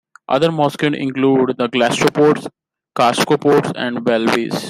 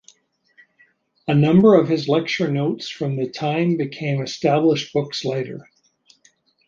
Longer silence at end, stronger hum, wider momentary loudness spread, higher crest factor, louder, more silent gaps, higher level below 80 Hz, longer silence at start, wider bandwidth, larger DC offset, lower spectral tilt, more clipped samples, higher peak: second, 0 s vs 1.05 s; neither; second, 7 LU vs 12 LU; about the same, 16 dB vs 18 dB; first, -16 LUFS vs -19 LUFS; neither; about the same, -58 dBFS vs -62 dBFS; second, 0.3 s vs 1.25 s; first, 16 kHz vs 7.4 kHz; neither; second, -5 dB/octave vs -7 dB/octave; neither; about the same, 0 dBFS vs -2 dBFS